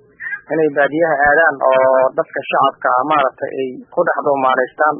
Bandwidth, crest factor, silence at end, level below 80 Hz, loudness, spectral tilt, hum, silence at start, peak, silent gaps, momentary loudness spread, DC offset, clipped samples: 3.6 kHz; 14 dB; 0 s; -54 dBFS; -15 LUFS; -10 dB/octave; none; 0.2 s; 0 dBFS; none; 10 LU; under 0.1%; under 0.1%